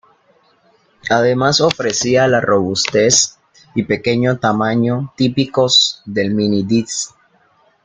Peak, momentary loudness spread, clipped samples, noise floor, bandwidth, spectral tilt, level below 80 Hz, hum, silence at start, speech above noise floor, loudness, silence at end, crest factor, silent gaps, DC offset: 0 dBFS; 9 LU; under 0.1%; -55 dBFS; 10 kHz; -3.5 dB/octave; -54 dBFS; none; 1.05 s; 40 dB; -15 LUFS; 0.75 s; 16 dB; none; under 0.1%